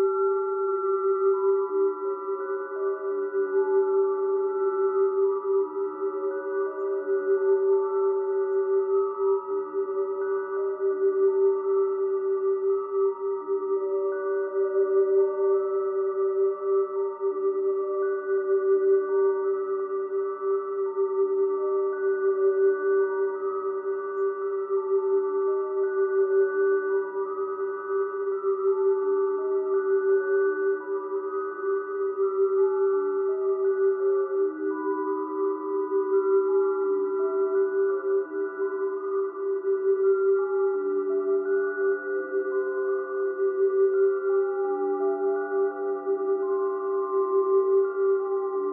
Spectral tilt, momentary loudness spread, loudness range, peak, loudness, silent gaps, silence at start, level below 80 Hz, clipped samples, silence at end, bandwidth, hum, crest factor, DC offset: -10 dB/octave; 6 LU; 1 LU; -14 dBFS; -26 LUFS; none; 0 s; under -90 dBFS; under 0.1%; 0 s; 2.1 kHz; none; 12 dB; under 0.1%